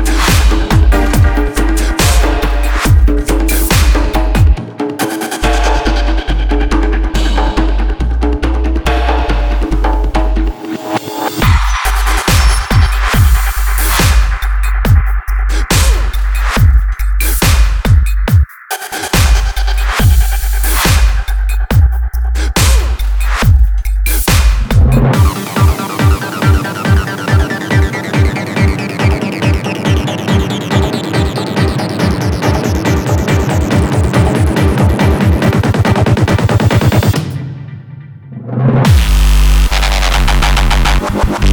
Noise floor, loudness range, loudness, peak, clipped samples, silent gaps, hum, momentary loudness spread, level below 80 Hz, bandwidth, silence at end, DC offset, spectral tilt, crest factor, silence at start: -30 dBFS; 3 LU; -12 LUFS; 0 dBFS; under 0.1%; none; none; 6 LU; -12 dBFS; over 20 kHz; 0 s; under 0.1%; -5 dB/octave; 10 dB; 0 s